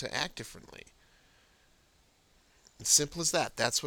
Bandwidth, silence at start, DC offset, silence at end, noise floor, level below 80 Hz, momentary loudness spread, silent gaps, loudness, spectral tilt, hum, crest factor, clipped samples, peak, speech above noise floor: over 20 kHz; 0 s; under 0.1%; 0 s; -67 dBFS; -62 dBFS; 25 LU; none; -28 LUFS; -1 dB/octave; none; 24 dB; under 0.1%; -10 dBFS; 35 dB